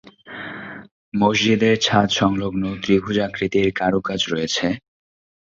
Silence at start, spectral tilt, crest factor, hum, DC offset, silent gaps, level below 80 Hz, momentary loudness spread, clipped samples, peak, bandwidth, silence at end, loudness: 0.25 s; -4.5 dB/octave; 20 dB; none; under 0.1%; 0.91-1.12 s; -48 dBFS; 16 LU; under 0.1%; -2 dBFS; 7.6 kHz; 0.65 s; -19 LUFS